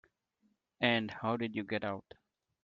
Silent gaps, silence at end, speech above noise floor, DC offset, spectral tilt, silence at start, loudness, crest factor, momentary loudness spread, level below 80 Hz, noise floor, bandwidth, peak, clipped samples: none; 0.65 s; 42 dB; under 0.1%; -3 dB/octave; 0.8 s; -35 LUFS; 22 dB; 8 LU; -74 dBFS; -77 dBFS; 7 kHz; -14 dBFS; under 0.1%